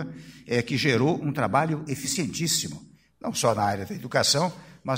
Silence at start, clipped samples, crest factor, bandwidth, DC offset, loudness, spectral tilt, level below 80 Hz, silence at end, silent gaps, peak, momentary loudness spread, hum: 0 s; under 0.1%; 20 dB; 16 kHz; under 0.1%; -25 LUFS; -4 dB/octave; -60 dBFS; 0 s; none; -6 dBFS; 14 LU; none